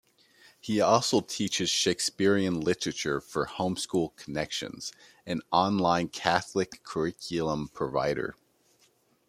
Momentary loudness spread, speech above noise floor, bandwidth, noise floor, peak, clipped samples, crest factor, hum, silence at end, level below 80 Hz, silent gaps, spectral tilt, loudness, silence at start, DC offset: 10 LU; 38 dB; 15.5 kHz; -67 dBFS; -6 dBFS; under 0.1%; 22 dB; none; 0.95 s; -60 dBFS; none; -4 dB/octave; -28 LUFS; 0.65 s; under 0.1%